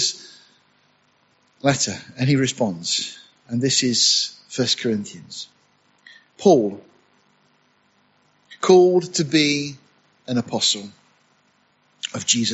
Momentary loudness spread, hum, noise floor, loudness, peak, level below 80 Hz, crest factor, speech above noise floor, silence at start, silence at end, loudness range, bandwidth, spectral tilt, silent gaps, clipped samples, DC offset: 17 LU; 50 Hz at -55 dBFS; -62 dBFS; -20 LUFS; -2 dBFS; -64 dBFS; 20 dB; 42 dB; 0 s; 0 s; 4 LU; 8.2 kHz; -3.5 dB/octave; none; under 0.1%; under 0.1%